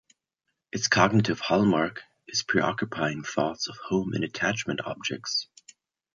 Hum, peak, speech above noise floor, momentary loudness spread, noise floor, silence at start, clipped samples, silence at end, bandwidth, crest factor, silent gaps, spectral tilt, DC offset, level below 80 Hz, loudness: none; -4 dBFS; 55 dB; 10 LU; -81 dBFS; 0.75 s; under 0.1%; 0.7 s; 7.6 kHz; 24 dB; none; -4.5 dB/octave; under 0.1%; -60 dBFS; -26 LUFS